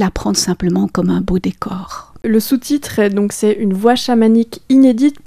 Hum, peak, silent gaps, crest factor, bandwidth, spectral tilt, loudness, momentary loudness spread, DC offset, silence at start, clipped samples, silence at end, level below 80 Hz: none; 0 dBFS; none; 14 dB; 15.5 kHz; -5.5 dB/octave; -14 LUFS; 11 LU; under 0.1%; 0 s; under 0.1%; 0.1 s; -36 dBFS